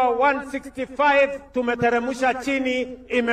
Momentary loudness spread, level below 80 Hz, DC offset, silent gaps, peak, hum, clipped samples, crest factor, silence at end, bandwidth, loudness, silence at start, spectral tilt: 9 LU; -52 dBFS; under 0.1%; none; -8 dBFS; none; under 0.1%; 14 dB; 0 s; 13 kHz; -22 LUFS; 0 s; -4.5 dB/octave